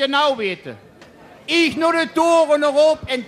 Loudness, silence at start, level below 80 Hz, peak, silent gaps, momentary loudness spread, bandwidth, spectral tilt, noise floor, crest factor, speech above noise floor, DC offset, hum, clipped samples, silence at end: -17 LUFS; 0 s; -56 dBFS; -4 dBFS; none; 14 LU; 13.5 kHz; -3.5 dB/octave; -44 dBFS; 14 dB; 27 dB; under 0.1%; none; under 0.1%; 0 s